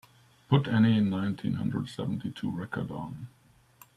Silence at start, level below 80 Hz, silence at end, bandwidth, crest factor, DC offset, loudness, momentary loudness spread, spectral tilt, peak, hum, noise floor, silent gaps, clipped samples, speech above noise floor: 0.5 s; -64 dBFS; 0.7 s; 12.5 kHz; 20 dB; under 0.1%; -29 LUFS; 15 LU; -8 dB/octave; -10 dBFS; none; -58 dBFS; none; under 0.1%; 30 dB